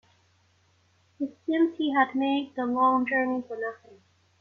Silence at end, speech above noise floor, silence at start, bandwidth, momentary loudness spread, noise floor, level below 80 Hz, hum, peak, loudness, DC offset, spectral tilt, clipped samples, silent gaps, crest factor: 0.65 s; 39 dB; 1.2 s; 6.4 kHz; 12 LU; -65 dBFS; -72 dBFS; none; -8 dBFS; -27 LUFS; under 0.1%; -6 dB/octave; under 0.1%; none; 20 dB